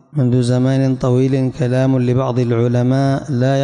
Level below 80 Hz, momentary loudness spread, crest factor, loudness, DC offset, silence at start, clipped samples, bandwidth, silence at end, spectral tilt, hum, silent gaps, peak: -46 dBFS; 2 LU; 10 dB; -16 LUFS; under 0.1%; 0.15 s; under 0.1%; 10 kHz; 0 s; -8 dB/octave; none; none; -6 dBFS